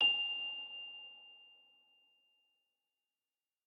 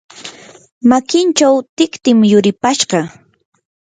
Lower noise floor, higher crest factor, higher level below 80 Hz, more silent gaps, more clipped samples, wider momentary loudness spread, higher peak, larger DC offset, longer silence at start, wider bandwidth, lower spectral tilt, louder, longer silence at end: first, under -90 dBFS vs -35 dBFS; first, 20 dB vs 14 dB; second, under -90 dBFS vs -56 dBFS; second, none vs 0.72-0.81 s, 1.69-1.77 s; neither; first, 23 LU vs 18 LU; second, -22 dBFS vs 0 dBFS; neither; second, 0 s vs 0.2 s; about the same, 9 kHz vs 9.6 kHz; second, -0.5 dB/octave vs -4.5 dB/octave; second, -37 LUFS vs -12 LUFS; first, 2.2 s vs 0.7 s